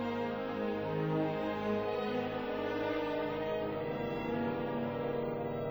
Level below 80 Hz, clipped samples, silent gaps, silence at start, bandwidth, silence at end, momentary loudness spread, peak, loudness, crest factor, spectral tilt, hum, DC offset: -60 dBFS; under 0.1%; none; 0 s; over 20 kHz; 0 s; 3 LU; -22 dBFS; -36 LUFS; 14 dB; -8 dB/octave; none; under 0.1%